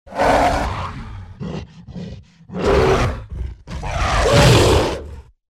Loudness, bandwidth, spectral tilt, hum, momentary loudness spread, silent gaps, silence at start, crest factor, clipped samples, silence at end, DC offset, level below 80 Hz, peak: -16 LUFS; 16 kHz; -5 dB/octave; none; 21 LU; none; 0.05 s; 16 dB; under 0.1%; 0.3 s; under 0.1%; -28 dBFS; -4 dBFS